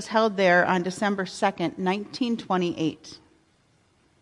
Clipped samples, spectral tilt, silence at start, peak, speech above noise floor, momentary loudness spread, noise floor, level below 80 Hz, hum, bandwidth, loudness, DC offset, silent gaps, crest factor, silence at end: under 0.1%; -5.5 dB/octave; 0 s; -8 dBFS; 39 dB; 10 LU; -64 dBFS; -68 dBFS; none; 11.5 kHz; -25 LUFS; under 0.1%; none; 18 dB; 1.05 s